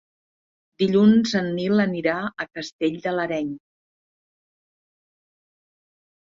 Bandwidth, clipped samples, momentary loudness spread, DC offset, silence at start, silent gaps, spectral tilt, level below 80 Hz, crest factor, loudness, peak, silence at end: 7.6 kHz; under 0.1%; 15 LU; under 0.1%; 0.8 s; 2.73-2.79 s; -6.5 dB/octave; -64 dBFS; 18 dB; -22 LUFS; -6 dBFS; 2.65 s